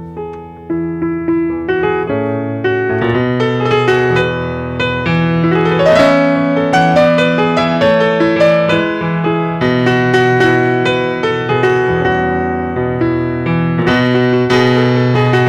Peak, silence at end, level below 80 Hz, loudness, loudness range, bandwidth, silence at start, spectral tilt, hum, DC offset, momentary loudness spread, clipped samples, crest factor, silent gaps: -2 dBFS; 0 s; -40 dBFS; -13 LUFS; 3 LU; 10 kHz; 0 s; -7 dB/octave; none; under 0.1%; 7 LU; under 0.1%; 12 dB; none